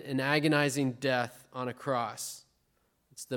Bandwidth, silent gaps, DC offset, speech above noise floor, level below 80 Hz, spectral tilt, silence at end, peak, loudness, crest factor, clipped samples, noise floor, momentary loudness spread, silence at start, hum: 17.5 kHz; none; under 0.1%; 43 dB; -76 dBFS; -4.5 dB/octave; 0 s; -12 dBFS; -31 LUFS; 20 dB; under 0.1%; -74 dBFS; 14 LU; 0 s; none